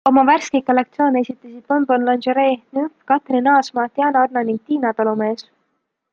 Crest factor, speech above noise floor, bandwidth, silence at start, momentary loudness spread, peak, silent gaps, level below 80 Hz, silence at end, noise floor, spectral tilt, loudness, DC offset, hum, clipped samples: 16 dB; 54 dB; 7.4 kHz; 0.05 s; 8 LU; -2 dBFS; none; -68 dBFS; 0.7 s; -71 dBFS; -5 dB/octave; -18 LUFS; under 0.1%; none; under 0.1%